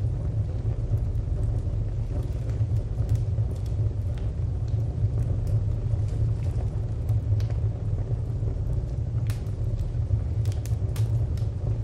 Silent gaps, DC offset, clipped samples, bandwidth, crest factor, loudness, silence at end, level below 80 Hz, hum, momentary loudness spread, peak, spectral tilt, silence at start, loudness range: none; under 0.1%; under 0.1%; 9.2 kHz; 12 dB; -28 LUFS; 0 s; -32 dBFS; none; 4 LU; -12 dBFS; -8.5 dB/octave; 0 s; 1 LU